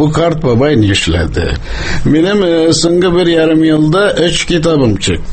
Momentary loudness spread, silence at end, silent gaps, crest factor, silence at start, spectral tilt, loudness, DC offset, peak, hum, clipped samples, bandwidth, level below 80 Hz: 6 LU; 0 s; none; 10 dB; 0 s; -5.5 dB/octave; -11 LUFS; under 0.1%; 0 dBFS; none; under 0.1%; 8.8 kHz; -24 dBFS